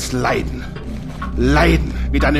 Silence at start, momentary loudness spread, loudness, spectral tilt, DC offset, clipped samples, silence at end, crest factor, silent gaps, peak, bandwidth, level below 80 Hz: 0 s; 15 LU; -18 LUFS; -6 dB/octave; under 0.1%; under 0.1%; 0 s; 14 dB; none; -4 dBFS; 14 kHz; -22 dBFS